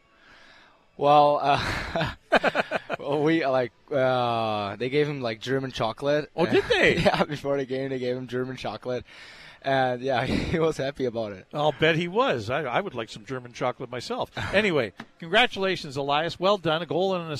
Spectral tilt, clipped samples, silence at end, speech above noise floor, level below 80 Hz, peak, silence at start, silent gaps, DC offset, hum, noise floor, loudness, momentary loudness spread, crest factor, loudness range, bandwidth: -5.5 dB/octave; under 0.1%; 0 s; 30 dB; -50 dBFS; -6 dBFS; 1 s; none; under 0.1%; none; -55 dBFS; -25 LUFS; 12 LU; 20 dB; 4 LU; 14 kHz